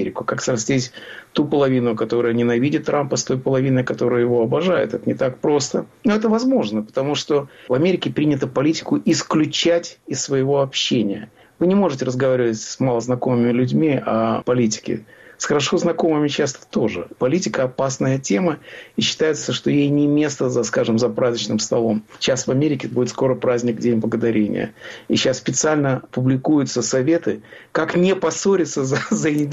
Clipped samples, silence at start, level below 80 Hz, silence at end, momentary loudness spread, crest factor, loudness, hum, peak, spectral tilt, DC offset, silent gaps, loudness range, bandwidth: under 0.1%; 0 s; -58 dBFS; 0 s; 5 LU; 12 dB; -19 LUFS; none; -8 dBFS; -5 dB/octave; under 0.1%; none; 1 LU; 8.2 kHz